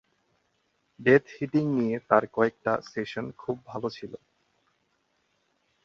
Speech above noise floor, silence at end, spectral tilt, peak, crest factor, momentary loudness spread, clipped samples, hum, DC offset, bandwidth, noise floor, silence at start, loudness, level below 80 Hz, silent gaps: 46 dB; 1.7 s; -7.5 dB/octave; -6 dBFS; 24 dB; 13 LU; under 0.1%; none; under 0.1%; 7.2 kHz; -73 dBFS; 1 s; -27 LUFS; -66 dBFS; none